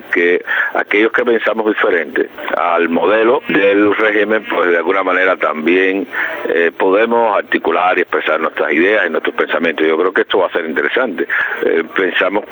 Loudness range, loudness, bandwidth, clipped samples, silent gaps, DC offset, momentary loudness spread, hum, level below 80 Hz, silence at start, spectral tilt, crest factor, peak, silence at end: 2 LU; -14 LUFS; over 20 kHz; under 0.1%; none; under 0.1%; 4 LU; none; -62 dBFS; 0 s; -6 dB/octave; 12 dB; -2 dBFS; 0 s